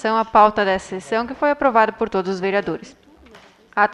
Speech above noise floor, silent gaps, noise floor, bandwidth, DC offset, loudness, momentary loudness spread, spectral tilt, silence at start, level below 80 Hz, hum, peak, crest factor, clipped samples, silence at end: 29 dB; none; -47 dBFS; 11 kHz; under 0.1%; -19 LUFS; 10 LU; -5.5 dB/octave; 0 s; -52 dBFS; none; -2 dBFS; 18 dB; under 0.1%; 0 s